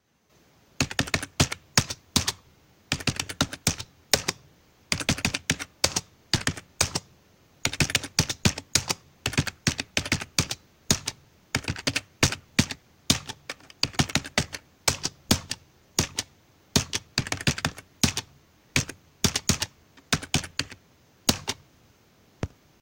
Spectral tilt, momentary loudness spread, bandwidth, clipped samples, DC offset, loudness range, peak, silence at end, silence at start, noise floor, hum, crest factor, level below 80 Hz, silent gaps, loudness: -2.5 dB/octave; 10 LU; 17 kHz; under 0.1%; under 0.1%; 2 LU; 0 dBFS; 0.35 s; 0.8 s; -63 dBFS; none; 30 dB; -46 dBFS; none; -27 LUFS